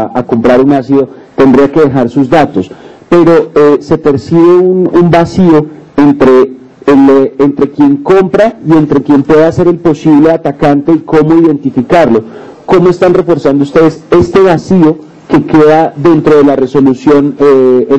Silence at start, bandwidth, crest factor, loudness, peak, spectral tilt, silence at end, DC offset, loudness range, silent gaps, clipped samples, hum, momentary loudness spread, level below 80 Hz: 0 s; 8.4 kHz; 6 dB; -6 LUFS; 0 dBFS; -8 dB/octave; 0 s; 1%; 1 LU; none; 8%; none; 5 LU; -38 dBFS